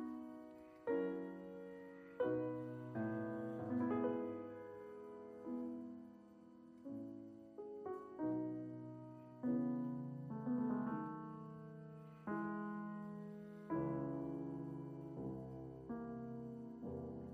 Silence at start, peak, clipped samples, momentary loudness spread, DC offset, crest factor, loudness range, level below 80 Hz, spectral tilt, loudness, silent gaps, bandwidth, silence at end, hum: 0 s; -28 dBFS; under 0.1%; 14 LU; under 0.1%; 16 dB; 5 LU; -74 dBFS; -10 dB/octave; -46 LUFS; none; 4.8 kHz; 0 s; none